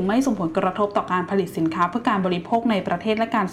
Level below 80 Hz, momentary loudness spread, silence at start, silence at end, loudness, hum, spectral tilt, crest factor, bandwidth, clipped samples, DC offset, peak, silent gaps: -56 dBFS; 2 LU; 0 s; 0 s; -22 LUFS; none; -6.5 dB/octave; 14 dB; 15 kHz; under 0.1%; under 0.1%; -8 dBFS; none